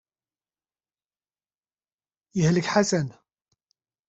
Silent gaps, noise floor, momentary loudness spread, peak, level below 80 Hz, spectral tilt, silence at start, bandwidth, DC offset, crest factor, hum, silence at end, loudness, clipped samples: none; under -90 dBFS; 12 LU; -6 dBFS; -62 dBFS; -5.5 dB/octave; 2.35 s; 8.2 kHz; under 0.1%; 24 dB; none; 0.95 s; -24 LUFS; under 0.1%